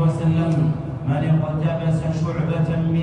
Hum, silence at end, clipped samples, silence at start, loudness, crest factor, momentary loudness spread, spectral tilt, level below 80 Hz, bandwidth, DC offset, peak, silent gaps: none; 0 s; under 0.1%; 0 s; -21 LUFS; 10 dB; 4 LU; -9 dB/octave; -42 dBFS; 8.8 kHz; under 0.1%; -8 dBFS; none